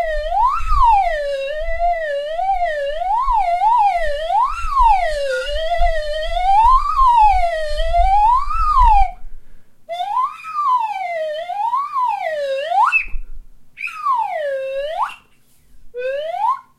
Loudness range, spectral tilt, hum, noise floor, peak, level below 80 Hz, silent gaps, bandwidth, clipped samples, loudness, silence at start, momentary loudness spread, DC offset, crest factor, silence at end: 6 LU; -3 dB/octave; none; -51 dBFS; 0 dBFS; -26 dBFS; none; 11.5 kHz; under 0.1%; -17 LUFS; 0 s; 10 LU; under 0.1%; 16 dB; 0.2 s